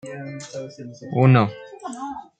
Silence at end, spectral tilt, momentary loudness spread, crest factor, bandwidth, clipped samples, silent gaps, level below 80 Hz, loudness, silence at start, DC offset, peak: 0.15 s; -7.5 dB/octave; 20 LU; 20 dB; 8.8 kHz; under 0.1%; none; -64 dBFS; -19 LUFS; 0.05 s; under 0.1%; -2 dBFS